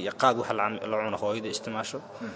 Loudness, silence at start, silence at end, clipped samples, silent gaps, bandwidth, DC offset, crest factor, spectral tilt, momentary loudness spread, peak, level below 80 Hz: -29 LUFS; 0 s; 0 s; under 0.1%; none; 8 kHz; under 0.1%; 22 dB; -4 dB/octave; 9 LU; -8 dBFS; -68 dBFS